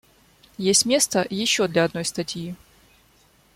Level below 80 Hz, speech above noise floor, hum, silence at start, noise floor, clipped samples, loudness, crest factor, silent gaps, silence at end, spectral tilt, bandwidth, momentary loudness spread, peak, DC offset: -60 dBFS; 36 dB; none; 0.6 s; -58 dBFS; under 0.1%; -21 LUFS; 20 dB; none; 1 s; -2.5 dB/octave; 16.5 kHz; 15 LU; -4 dBFS; under 0.1%